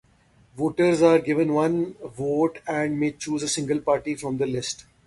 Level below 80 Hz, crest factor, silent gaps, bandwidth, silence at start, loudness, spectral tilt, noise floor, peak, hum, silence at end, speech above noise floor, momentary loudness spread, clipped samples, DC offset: -58 dBFS; 18 dB; none; 11.5 kHz; 0.55 s; -24 LUFS; -5 dB/octave; -58 dBFS; -6 dBFS; none; 0.25 s; 35 dB; 10 LU; under 0.1%; under 0.1%